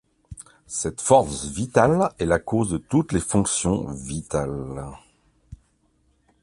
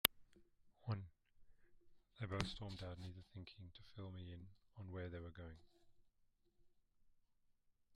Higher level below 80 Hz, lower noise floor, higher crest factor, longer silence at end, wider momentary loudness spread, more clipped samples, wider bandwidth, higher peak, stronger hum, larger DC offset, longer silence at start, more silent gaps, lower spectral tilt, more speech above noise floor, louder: first, -44 dBFS vs -68 dBFS; second, -65 dBFS vs -78 dBFS; second, 22 dB vs 44 dB; first, 0.9 s vs 0 s; about the same, 16 LU vs 14 LU; neither; about the same, 11.5 kHz vs 12 kHz; first, -2 dBFS vs -6 dBFS; neither; neither; first, 0.3 s vs 0.05 s; neither; first, -5 dB/octave vs -3.5 dB/octave; first, 42 dB vs 27 dB; first, -23 LUFS vs -50 LUFS